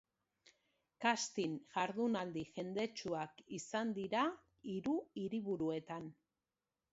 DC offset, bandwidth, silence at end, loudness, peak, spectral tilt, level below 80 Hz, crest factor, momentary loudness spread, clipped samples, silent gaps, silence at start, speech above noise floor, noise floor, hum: under 0.1%; 7.6 kHz; 0.8 s; -41 LUFS; -18 dBFS; -4 dB/octave; -78 dBFS; 24 dB; 10 LU; under 0.1%; none; 1 s; over 50 dB; under -90 dBFS; none